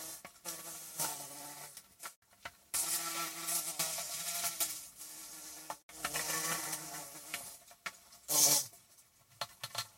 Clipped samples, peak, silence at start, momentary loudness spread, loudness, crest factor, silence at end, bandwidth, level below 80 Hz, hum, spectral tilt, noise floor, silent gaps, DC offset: under 0.1%; -14 dBFS; 0 s; 17 LU; -36 LUFS; 26 dB; 0 s; 16.5 kHz; -76 dBFS; none; 0 dB/octave; -65 dBFS; 2.16-2.22 s, 5.83-5.89 s; under 0.1%